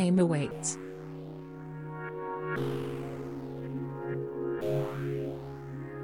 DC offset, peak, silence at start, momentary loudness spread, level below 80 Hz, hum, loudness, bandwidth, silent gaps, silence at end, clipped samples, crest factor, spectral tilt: under 0.1%; -16 dBFS; 0 s; 12 LU; -62 dBFS; none; -35 LUFS; 16 kHz; none; 0 s; under 0.1%; 18 dB; -6 dB/octave